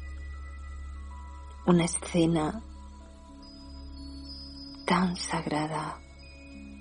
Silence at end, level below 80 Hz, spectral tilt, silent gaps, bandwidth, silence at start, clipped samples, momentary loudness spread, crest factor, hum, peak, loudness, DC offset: 0 s; -46 dBFS; -5.5 dB/octave; none; 10.5 kHz; 0 s; under 0.1%; 22 LU; 24 dB; none; -8 dBFS; -29 LUFS; under 0.1%